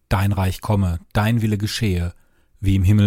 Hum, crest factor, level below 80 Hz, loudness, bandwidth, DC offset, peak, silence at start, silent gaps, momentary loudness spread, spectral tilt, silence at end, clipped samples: none; 14 dB; -34 dBFS; -21 LUFS; 16 kHz; under 0.1%; -4 dBFS; 0.1 s; none; 5 LU; -6.5 dB/octave; 0 s; under 0.1%